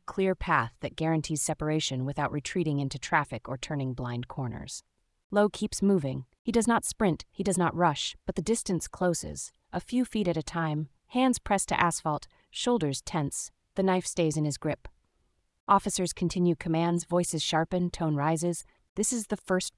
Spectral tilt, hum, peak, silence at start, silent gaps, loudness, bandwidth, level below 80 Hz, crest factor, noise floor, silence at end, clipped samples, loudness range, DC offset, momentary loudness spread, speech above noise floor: -5 dB/octave; none; -8 dBFS; 0.1 s; 5.24-5.30 s, 6.39-6.45 s, 15.60-15.67 s, 18.89-18.96 s; -29 LUFS; 12 kHz; -52 dBFS; 20 dB; -73 dBFS; 0.1 s; under 0.1%; 3 LU; under 0.1%; 10 LU; 44 dB